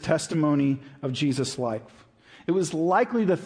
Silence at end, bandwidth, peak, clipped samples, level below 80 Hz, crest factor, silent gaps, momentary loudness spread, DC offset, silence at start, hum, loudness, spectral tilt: 0 s; 10.5 kHz; -8 dBFS; under 0.1%; -62 dBFS; 18 dB; none; 9 LU; under 0.1%; 0 s; none; -25 LUFS; -6 dB/octave